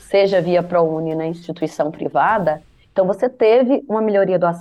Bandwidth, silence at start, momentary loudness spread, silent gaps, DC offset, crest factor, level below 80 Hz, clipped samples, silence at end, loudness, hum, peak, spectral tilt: 11.5 kHz; 0.1 s; 10 LU; none; under 0.1%; 12 dB; -56 dBFS; under 0.1%; 0 s; -18 LUFS; none; -4 dBFS; -7 dB/octave